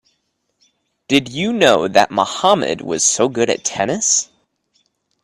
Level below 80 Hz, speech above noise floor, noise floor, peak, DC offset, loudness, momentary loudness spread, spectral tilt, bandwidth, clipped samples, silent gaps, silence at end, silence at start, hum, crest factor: -56 dBFS; 53 dB; -69 dBFS; 0 dBFS; under 0.1%; -16 LUFS; 6 LU; -2.5 dB/octave; 14 kHz; under 0.1%; none; 1 s; 1.1 s; none; 18 dB